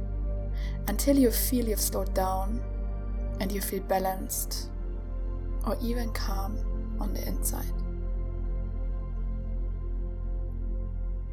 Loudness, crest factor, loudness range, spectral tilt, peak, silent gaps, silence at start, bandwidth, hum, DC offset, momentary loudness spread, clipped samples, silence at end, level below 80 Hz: -31 LUFS; 18 dB; 7 LU; -5 dB/octave; -12 dBFS; none; 0 s; 19 kHz; none; under 0.1%; 9 LU; under 0.1%; 0 s; -32 dBFS